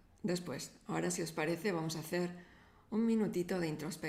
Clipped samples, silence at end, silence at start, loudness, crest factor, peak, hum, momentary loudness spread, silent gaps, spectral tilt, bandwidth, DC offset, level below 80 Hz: under 0.1%; 0 s; 0.25 s; -37 LUFS; 14 dB; -24 dBFS; none; 8 LU; none; -5 dB/octave; 16 kHz; under 0.1%; -70 dBFS